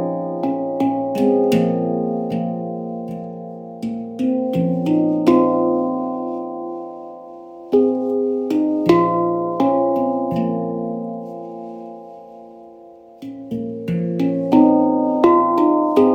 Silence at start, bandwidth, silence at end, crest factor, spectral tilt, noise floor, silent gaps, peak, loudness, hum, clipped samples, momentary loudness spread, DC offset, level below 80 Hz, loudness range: 0 s; 16 kHz; 0 s; 18 dB; -8.5 dB/octave; -42 dBFS; none; -2 dBFS; -19 LUFS; none; under 0.1%; 18 LU; under 0.1%; -58 dBFS; 8 LU